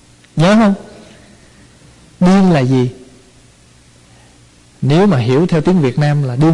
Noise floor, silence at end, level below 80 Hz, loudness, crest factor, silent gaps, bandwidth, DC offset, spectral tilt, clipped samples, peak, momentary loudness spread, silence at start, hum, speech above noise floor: -45 dBFS; 0 s; -44 dBFS; -12 LUFS; 10 dB; none; 11 kHz; under 0.1%; -7.5 dB/octave; under 0.1%; -4 dBFS; 9 LU; 0.35 s; 60 Hz at -45 dBFS; 34 dB